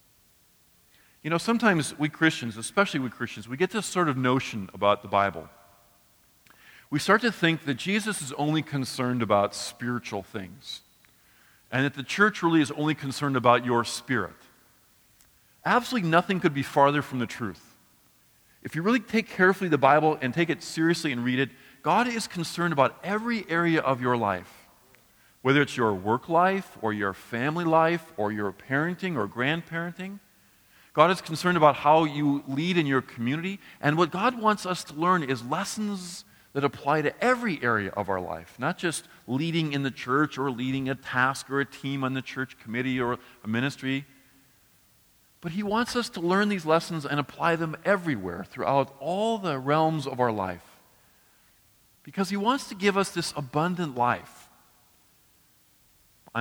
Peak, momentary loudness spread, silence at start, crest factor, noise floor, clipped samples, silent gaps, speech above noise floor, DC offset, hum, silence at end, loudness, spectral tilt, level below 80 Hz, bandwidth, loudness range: -4 dBFS; 11 LU; 1.25 s; 22 dB; -62 dBFS; under 0.1%; none; 36 dB; under 0.1%; none; 0 s; -26 LUFS; -5 dB/octave; -66 dBFS; over 20 kHz; 5 LU